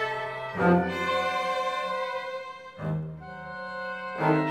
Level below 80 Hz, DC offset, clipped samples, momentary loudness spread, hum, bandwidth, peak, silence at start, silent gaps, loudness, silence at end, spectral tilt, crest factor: -60 dBFS; under 0.1%; under 0.1%; 14 LU; none; 15 kHz; -10 dBFS; 0 s; none; -29 LUFS; 0 s; -6.5 dB/octave; 20 dB